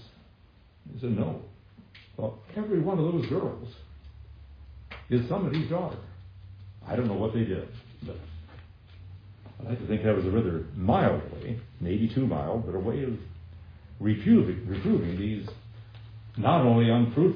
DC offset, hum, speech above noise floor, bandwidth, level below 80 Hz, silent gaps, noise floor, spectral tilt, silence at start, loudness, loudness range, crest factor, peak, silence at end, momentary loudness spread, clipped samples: under 0.1%; none; 30 dB; 5.2 kHz; -50 dBFS; none; -57 dBFS; -10.5 dB/octave; 0 s; -28 LUFS; 6 LU; 20 dB; -10 dBFS; 0 s; 25 LU; under 0.1%